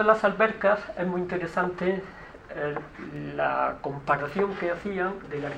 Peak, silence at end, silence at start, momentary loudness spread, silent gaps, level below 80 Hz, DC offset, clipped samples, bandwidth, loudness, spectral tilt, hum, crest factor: -6 dBFS; 0 s; 0 s; 13 LU; none; -54 dBFS; under 0.1%; under 0.1%; 9.6 kHz; -27 LUFS; -7 dB/octave; none; 22 dB